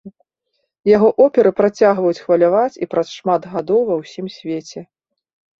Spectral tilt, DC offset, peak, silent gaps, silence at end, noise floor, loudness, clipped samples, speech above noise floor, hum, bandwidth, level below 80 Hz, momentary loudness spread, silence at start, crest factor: -6.5 dB/octave; under 0.1%; -2 dBFS; none; 0.75 s; -72 dBFS; -16 LUFS; under 0.1%; 56 dB; none; 7.6 kHz; -60 dBFS; 14 LU; 0.05 s; 16 dB